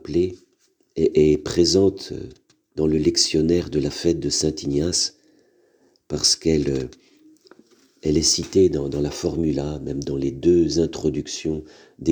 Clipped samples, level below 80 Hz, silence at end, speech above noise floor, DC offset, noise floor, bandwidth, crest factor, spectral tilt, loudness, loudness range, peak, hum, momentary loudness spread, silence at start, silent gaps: under 0.1%; -42 dBFS; 0 s; 43 dB; under 0.1%; -64 dBFS; over 20 kHz; 18 dB; -4.5 dB/octave; -21 LUFS; 3 LU; -4 dBFS; none; 11 LU; 0.05 s; none